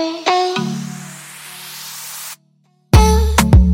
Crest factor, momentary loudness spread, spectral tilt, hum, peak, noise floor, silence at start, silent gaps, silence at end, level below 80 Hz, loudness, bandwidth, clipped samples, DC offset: 16 dB; 20 LU; -5.5 dB/octave; none; 0 dBFS; -58 dBFS; 0 s; none; 0 s; -20 dBFS; -15 LUFS; 17 kHz; under 0.1%; under 0.1%